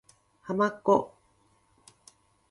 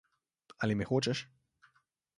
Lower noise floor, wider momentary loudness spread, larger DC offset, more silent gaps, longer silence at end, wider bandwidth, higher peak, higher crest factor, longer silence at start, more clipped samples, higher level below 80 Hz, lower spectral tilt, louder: second, -67 dBFS vs -74 dBFS; first, 20 LU vs 9 LU; neither; neither; first, 1.45 s vs 0.95 s; about the same, 11.5 kHz vs 11.5 kHz; first, -10 dBFS vs -18 dBFS; about the same, 22 dB vs 20 dB; second, 0.45 s vs 0.6 s; neither; second, -70 dBFS vs -64 dBFS; about the same, -6.5 dB/octave vs -5.5 dB/octave; first, -27 LUFS vs -34 LUFS